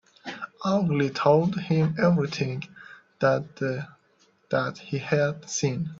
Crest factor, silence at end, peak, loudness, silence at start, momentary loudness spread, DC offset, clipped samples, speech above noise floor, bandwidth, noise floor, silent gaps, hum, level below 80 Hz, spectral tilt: 20 dB; 0 s; -6 dBFS; -25 LUFS; 0.25 s; 15 LU; under 0.1%; under 0.1%; 39 dB; 7.8 kHz; -64 dBFS; none; none; -64 dBFS; -6 dB/octave